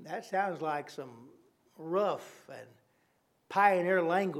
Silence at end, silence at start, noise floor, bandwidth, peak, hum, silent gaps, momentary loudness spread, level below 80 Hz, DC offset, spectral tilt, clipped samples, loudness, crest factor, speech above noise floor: 0 s; 0 s; -73 dBFS; 15 kHz; -12 dBFS; none; none; 23 LU; under -90 dBFS; under 0.1%; -6 dB/octave; under 0.1%; -31 LUFS; 22 dB; 41 dB